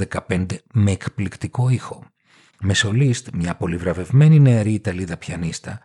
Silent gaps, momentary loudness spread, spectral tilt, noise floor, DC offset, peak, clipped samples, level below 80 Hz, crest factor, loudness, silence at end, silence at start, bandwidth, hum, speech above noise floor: none; 14 LU; -6 dB/octave; -54 dBFS; under 0.1%; -4 dBFS; under 0.1%; -46 dBFS; 16 dB; -19 LUFS; 0.05 s; 0 s; 11 kHz; none; 35 dB